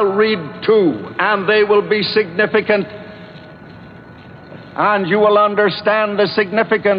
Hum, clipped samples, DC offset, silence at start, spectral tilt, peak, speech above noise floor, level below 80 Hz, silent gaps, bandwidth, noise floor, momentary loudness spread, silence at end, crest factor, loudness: none; under 0.1%; under 0.1%; 0 s; -8.5 dB/octave; -2 dBFS; 23 dB; -58 dBFS; none; 5.4 kHz; -37 dBFS; 7 LU; 0 s; 14 dB; -15 LUFS